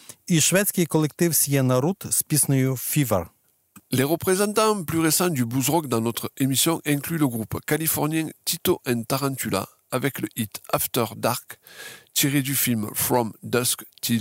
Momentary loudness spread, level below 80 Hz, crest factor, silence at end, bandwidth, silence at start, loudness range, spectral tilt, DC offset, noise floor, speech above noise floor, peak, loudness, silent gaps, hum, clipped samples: 8 LU; -58 dBFS; 16 dB; 0 s; 16.5 kHz; 0.1 s; 4 LU; -4 dB/octave; under 0.1%; -54 dBFS; 31 dB; -8 dBFS; -23 LUFS; none; none; under 0.1%